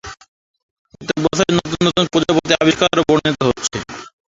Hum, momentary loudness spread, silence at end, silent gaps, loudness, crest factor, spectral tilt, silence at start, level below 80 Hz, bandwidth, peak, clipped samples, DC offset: none; 17 LU; 0.3 s; 0.28-0.54 s, 0.63-0.85 s; -16 LUFS; 16 dB; -4.5 dB/octave; 0.05 s; -46 dBFS; 8 kHz; 0 dBFS; under 0.1%; under 0.1%